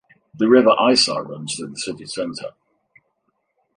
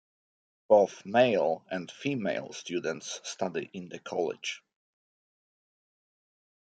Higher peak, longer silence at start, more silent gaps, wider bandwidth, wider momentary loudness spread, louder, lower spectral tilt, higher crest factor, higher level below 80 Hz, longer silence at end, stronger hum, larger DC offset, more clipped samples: first, -2 dBFS vs -8 dBFS; second, 0.35 s vs 0.7 s; neither; first, 11 kHz vs 9.2 kHz; about the same, 15 LU vs 14 LU; first, -18 LUFS vs -30 LUFS; about the same, -3.5 dB/octave vs -4.5 dB/octave; second, 18 dB vs 24 dB; first, -66 dBFS vs -80 dBFS; second, 1.25 s vs 2.05 s; neither; neither; neither